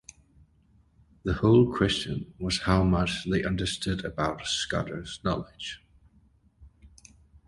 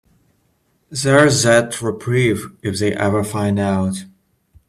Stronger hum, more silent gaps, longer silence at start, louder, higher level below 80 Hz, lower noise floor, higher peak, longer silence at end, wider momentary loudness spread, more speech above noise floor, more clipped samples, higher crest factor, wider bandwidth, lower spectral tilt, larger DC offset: neither; neither; first, 1.25 s vs 0.9 s; second, -27 LUFS vs -17 LUFS; first, -44 dBFS vs -52 dBFS; about the same, -62 dBFS vs -63 dBFS; second, -8 dBFS vs 0 dBFS; about the same, 0.6 s vs 0.6 s; about the same, 14 LU vs 12 LU; second, 36 dB vs 46 dB; neither; about the same, 22 dB vs 18 dB; second, 11.5 kHz vs 14.5 kHz; about the same, -5.5 dB/octave vs -5 dB/octave; neither